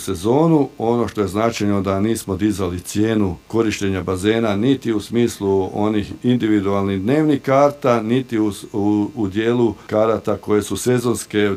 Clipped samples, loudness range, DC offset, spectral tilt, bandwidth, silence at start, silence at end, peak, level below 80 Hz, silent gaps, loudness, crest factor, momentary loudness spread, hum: under 0.1%; 2 LU; under 0.1%; -6 dB/octave; 16 kHz; 0 s; 0 s; -2 dBFS; -50 dBFS; none; -19 LUFS; 16 dB; 5 LU; none